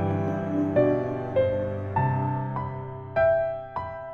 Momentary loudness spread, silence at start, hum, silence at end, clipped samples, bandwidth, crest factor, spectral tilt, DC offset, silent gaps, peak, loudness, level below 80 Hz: 11 LU; 0 s; none; 0 s; under 0.1%; 6.4 kHz; 16 dB; -10 dB/octave; under 0.1%; none; -10 dBFS; -26 LUFS; -50 dBFS